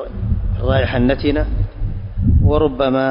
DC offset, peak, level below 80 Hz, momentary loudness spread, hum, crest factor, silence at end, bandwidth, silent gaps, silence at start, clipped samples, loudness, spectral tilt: under 0.1%; -4 dBFS; -22 dBFS; 9 LU; none; 12 dB; 0 s; 5.4 kHz; none; 0 s; under 0.1%; -18 LUFS; -12.5 dB/octave